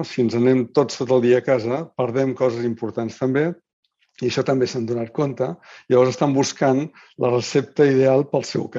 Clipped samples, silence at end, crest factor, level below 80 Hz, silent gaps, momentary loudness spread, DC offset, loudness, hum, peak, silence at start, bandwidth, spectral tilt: under 0.1%; 0 s; 16 dB; -64 dBFS; 3.73-3.83 s; 9 LU; under 0.1%; -20 LUFS; none; -4 dBFS; 0 s; 7.8 kHz; -6 dB/octave